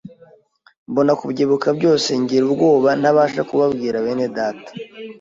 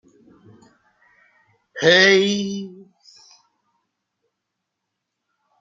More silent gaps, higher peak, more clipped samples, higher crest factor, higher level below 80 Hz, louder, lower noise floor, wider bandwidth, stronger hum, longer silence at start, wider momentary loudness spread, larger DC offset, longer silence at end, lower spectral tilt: first, 0.77-0.86 s vs none; about the same, -4 dBFS vs -2 dBFS; neither; second, 14 dB vs 22 dB; first, -60 dBFS vs -70 dBFS; about the same, -17 LUFS vs -16 LUFS; second, -52 dBFS vs -80 dBFS; about the same, 7.8 kHz vs 7.6 kHz; neither; second, 0.05 s vs 1.75 s; second, 10 LU vs 25 LU; neither; second, 0.1 s vs 2.9 s; first, -5.5 dB/octave vs -3.5 dB/octave